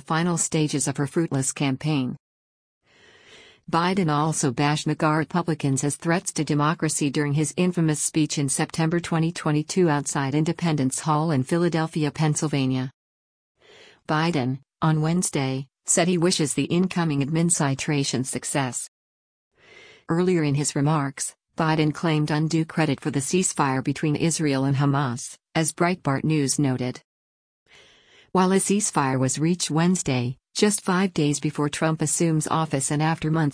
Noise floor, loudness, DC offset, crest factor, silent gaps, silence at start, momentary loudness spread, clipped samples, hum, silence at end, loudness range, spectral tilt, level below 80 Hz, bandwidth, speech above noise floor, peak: -55 dBFS; -23 LUFS; under 0.1%; 16 dB; 2.20-2.81 s, 12.94-13.55 s, 18.88-19.51 s, 27.04-27.66 s; 0.1 s; 5 LU; under 0.1%; none; 0 s; 3 LU; -5 dB/octave; -60 dBFS; 10.5 kHz; 33 dB; -6 dBFS